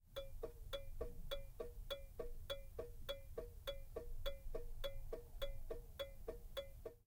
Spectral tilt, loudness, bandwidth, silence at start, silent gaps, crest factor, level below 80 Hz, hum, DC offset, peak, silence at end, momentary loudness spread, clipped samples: -4.5 dB/octave; -52 LUFS; 17 kHz; 0 s; none; 18 dB; -52 dBFS; none; under 0.1%; -30 dBFS; 0.05 s; 4 LU; under 0.1%